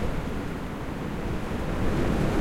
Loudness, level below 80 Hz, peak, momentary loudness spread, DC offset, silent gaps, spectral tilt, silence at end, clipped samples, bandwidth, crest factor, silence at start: -30 LUFS; -34 dBFS; -12 dBFS; 8 LU; under 0.1%; none; -7 dB/octave; 0 s; under 0.1%; 16 kHz; 14 dB; 0 s